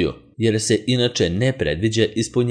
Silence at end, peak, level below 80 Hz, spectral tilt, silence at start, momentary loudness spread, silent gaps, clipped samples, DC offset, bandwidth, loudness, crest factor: 0 s; -4 dBFS; -44 dBFS; -5 dB/octave; 0 s; 3 LU; none; under 0.1%; under 0.1%; 11 kHz; -20 LUFS; 16 dB